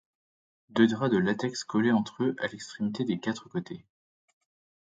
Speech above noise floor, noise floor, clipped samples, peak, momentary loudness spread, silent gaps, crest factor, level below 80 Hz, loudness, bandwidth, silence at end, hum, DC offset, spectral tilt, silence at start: over 62 dB; under -90 dBFS; under 0.1%; -8 dBFS; 11 LU; none; 20 dB; -68 dBFS; -29 LUFS; 9 kHz; 1 s; none; under 0.1%; -6 dB/octave; 0.75 s